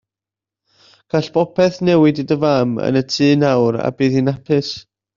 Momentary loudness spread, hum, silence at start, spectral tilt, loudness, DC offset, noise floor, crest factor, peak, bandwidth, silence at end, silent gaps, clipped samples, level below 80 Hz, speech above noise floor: 6 LU; none; 1.15 s; -6.5 dB/octave; -16 LUFS; under 0.1%; -88 dBFS; 14 dB; -2 dBFS; 7.4 kHz; 0.35 s; none; under 0.1%; -54 dBFS; 73 dB